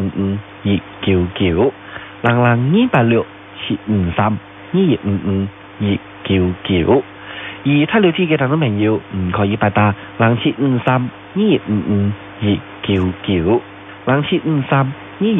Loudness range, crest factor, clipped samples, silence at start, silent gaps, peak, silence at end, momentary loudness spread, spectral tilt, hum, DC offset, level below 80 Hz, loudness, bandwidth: 2 LU; 16 dB; under 0.1%; 0 s; none; 0 dBFS; 0 s; 9 LU; -10 dB/octave; none; under 0.1%; -44 dBFS; -17 LUFS; 3.9 kHz